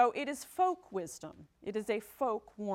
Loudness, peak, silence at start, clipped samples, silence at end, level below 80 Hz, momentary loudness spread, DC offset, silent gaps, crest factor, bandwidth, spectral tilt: -36 LUFS; -16 dBFS; 0 s; under 0.1%; 0 s; -72 dBFS; 13 LU; under 0.1%; none; 18 dB; 16.5 kHz; -4.5 dB/octave